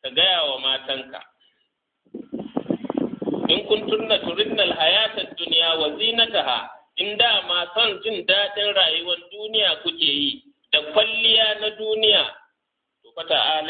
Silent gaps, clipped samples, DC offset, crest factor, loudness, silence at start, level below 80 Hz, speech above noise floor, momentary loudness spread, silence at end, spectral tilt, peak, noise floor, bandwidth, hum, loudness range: none; under 0.1%; under 0.1%; 20 dB; -20 LUFS; 0.05 s; -64 dBFS; 57 dB; 11 LU; 0 s; -7 dB/octave; -2 dBFS; -78 dBFS; 4.8 kHz; none; 6 LU